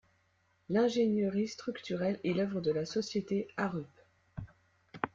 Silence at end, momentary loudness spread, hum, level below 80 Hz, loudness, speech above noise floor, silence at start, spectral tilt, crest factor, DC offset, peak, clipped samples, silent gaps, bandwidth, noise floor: 0.05 s; 18 LU; none; -66 dBFS; -34 LUFS; 40 dB; 0.7 s; -6 dB/octave; 20 dB; under 0.1%; -14 dBFS; under 0.1%; none; 7.6 kHz; -73 dBFS